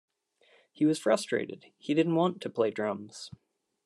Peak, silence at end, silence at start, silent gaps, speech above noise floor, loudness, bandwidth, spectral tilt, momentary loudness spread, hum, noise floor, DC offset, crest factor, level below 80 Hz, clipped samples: -12 dBFS; 0.6 s; 0.8 s; none; 37 dB; -29 LUFS; 12.5 kHz; -5.5 dB/octave; 17 LU; none; -66 dBFS; under 0.1%; 18 dB; -80 dBFS; under 0.1%